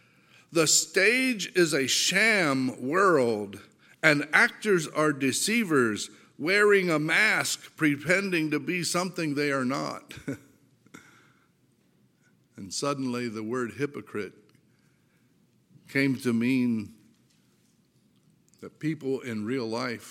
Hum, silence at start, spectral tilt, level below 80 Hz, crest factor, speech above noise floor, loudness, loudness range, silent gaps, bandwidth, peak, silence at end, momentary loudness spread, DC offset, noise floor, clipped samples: none; 0.5 s; -3.5 dB/octave; -74 dBFS; 24 dB; 40 dB; -25 LUFS; 12 LU; none; 17 kHz; -4 dBFS; 0 s; 14 LU; under 0.1%; -66 dBFS; under 0.1%